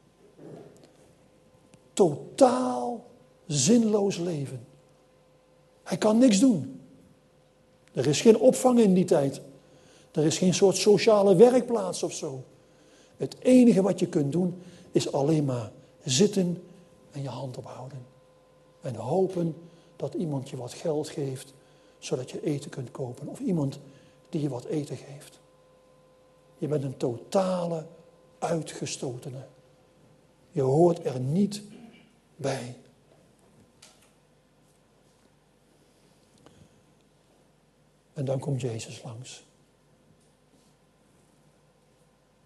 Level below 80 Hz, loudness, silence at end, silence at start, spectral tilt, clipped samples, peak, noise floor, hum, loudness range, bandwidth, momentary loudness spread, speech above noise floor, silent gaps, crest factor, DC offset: -70 dBFS; -26 LUFS; 3.05 s; 0.4 s; -5.5 dB/octave; under 0.1%; -4 dBFS; -63 dBFS; none; 14 LU; 12.5 kHz; 22 LU; 38 dB; none; 24 dB; under 0.1%